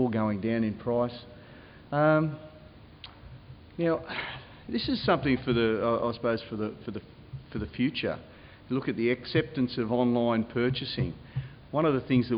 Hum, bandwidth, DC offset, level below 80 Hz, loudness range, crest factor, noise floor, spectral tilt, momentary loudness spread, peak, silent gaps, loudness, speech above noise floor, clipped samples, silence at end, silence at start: none; 5.4 kHz; under 0.1%; -54 dBFS; 3 LU; 18 dB; -50 dBFS; -10.5 dB/octave; 20 LU; -12 dBFS; none; -29 LUFS; 22 dB; under 0.1%; 0 s; 0 s